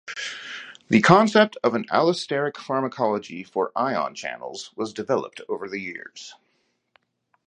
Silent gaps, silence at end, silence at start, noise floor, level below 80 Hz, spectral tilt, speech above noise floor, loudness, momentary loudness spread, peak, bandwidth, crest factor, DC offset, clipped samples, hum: none; 1.15 s; 0.05 s; -70 dBFS; -66 dBFS; -5.5 dB/octave; 47 dB; -23 LUFS; 19 LU; 0 dBFS; 10 kHz; 24 dB; under 0.1%; under 0.1%; none